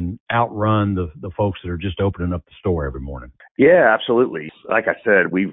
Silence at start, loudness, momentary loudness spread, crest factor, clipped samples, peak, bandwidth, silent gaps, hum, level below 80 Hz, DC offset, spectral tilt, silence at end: 0 s; -19 LUFS; 15 LU; 16 dB; under 0.1%; -2 dBFS; 3.9 kHz; 0.20-0.26 s, 3.51-3.55 s; none; -36 dBFS; under 0.1%; -12 dB/octave; 0 s